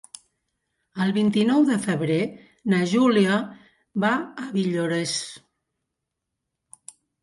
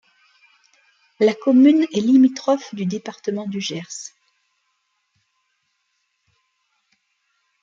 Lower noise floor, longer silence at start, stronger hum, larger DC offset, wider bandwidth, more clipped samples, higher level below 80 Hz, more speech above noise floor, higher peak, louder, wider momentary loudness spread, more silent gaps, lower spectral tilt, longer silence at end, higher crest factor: first, -82 dBFS vs -71 dBFS; second, 0.95 s vs 1.2 s; neither; neither; first, 11.5 kHz vs 7.6 kHz; neither; first, -68 dBFS vs -74 dBFS; first, 60 dB vs 53 dB; second, -8 dBFS vs -4 dBFS; second, -23 LUFS vs -18 LUFS; second, 13 LU vs 16 LU; neither; about the same, -5.5 dB/octave vs -5.5 dB/octave; second, 1.85 s vs 3.55 s; about the same, 16 dB vs 18 dB